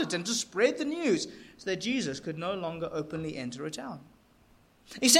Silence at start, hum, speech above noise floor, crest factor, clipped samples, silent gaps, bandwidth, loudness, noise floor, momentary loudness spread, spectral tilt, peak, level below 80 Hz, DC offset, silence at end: 0 s; none; 32 dB; 24 dB; under 0.1%; none; 16.5 kHz; -32 LUFS; -62 dBFS; 13 LU; -2.5 dB/octave; -6 dBFS; -66 dBFS; under 0.1%; 0 s